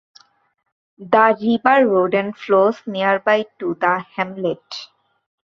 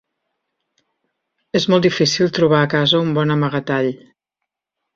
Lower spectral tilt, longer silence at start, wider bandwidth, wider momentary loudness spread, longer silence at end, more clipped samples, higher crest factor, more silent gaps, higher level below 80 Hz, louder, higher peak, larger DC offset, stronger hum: about the same, -6.5 dB/octave vs -5.5 dB/octave; second, 1 s vs 1.55 s; about the same, 7.2 kHz vs 7.6 kHz; first, 11 LU vs 7 LU; second, 0.6 s vs 1 s; neither; about the same, 18 dB vs 18 dB; neither; second, -66 dBFS vs -56 dBFS; about the same, -18 LUFS vs -16 LUFS; about the same, 0 dBFS vs -2 dBFS; neither; neither